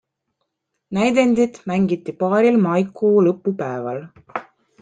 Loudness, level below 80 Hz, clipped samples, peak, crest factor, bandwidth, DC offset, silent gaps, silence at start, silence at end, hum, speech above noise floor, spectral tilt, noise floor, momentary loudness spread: -19 LUFS; -60 dBFS; under 0.1%; -4 dBFS; 16 dB; 9.4 kHz; under 0.1%; none; 0.9 s; 0.4 s; none; 57 dB; -7 dB/octave; -75 dBFS; 16 LU